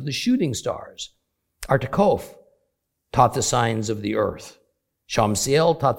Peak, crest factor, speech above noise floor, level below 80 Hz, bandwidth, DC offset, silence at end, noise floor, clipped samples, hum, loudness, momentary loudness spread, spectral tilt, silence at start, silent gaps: -2 dBFS; 22 dB; 54 dB; -48 dBFS; 17 kHz; under 0.1%; 0 s; -75 dBFS; under 0.1%; none; -22 LUFS; 17 LU; -4.5 dB/octave; 0 s; none